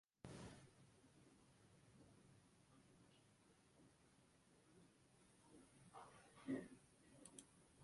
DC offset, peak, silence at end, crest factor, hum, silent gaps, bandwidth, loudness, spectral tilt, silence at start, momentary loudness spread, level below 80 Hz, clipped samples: under 0.1%; -38 dBFS; 0 s; 24 dB; none; none; 11.5 kHz; -58 LUFS; -5 dB/octave; 0.25 s; 17 LU; -82 dBFS; under 0.1%